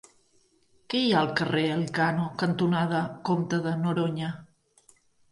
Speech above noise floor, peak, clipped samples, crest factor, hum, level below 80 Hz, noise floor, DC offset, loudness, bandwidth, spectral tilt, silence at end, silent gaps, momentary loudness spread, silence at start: 39 dB; -10 dBFS; under 0.1%; 18 dB; none; -66 dBFS; -65 dBFS; under 0.1%; -27 LUFS; 11.5 kHz; -6.5 dB/octave; 0.85 s; none; 6 LU; 0.9 s